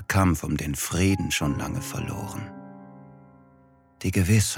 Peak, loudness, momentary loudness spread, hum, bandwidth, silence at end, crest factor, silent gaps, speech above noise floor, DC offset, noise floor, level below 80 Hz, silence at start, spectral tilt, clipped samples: -8 dBFS; -26 LUFS; 20 LU; none; 17 kHz; 0 s; 18 dB; none; 33 dB; under 0.1%; -57 dBFS; -44 dBFS; 0 s; -5 dB/octave; under 0.1%